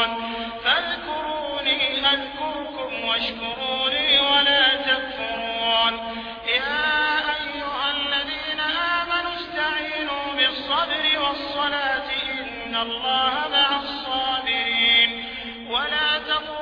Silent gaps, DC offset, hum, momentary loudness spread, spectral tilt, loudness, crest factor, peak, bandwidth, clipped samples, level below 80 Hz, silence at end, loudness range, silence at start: none; under 0.1%; none; 10 LU; -4 dB/octave; -21 LUFS; 16 dB; -6 dBFS; 5.4 kHz; under 0.1%; -52 dBFS; 0 s; 4 LU; 0 s